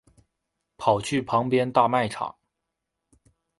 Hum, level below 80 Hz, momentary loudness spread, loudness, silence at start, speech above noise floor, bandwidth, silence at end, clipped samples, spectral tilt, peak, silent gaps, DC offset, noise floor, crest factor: none; -60 dBFS; 9 LU; -24 LUFS; 0.8 s; 59 dB; 11.5 kHz; 1.3 s; under 0.1%; -5.5 dB/octave; -6 dBFS; none; under 0.1%; -82 dBFS; 22 dB